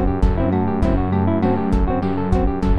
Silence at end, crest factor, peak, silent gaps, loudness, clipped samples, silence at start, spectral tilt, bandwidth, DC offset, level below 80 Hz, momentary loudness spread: 0 s; 12 dB; -4 dBFS; none; -19 LUFS; under 0.1%; 0 s; -9.5 dB/octave; 7.8 kHz; under 0.1%; -22 dBFS; 2 LU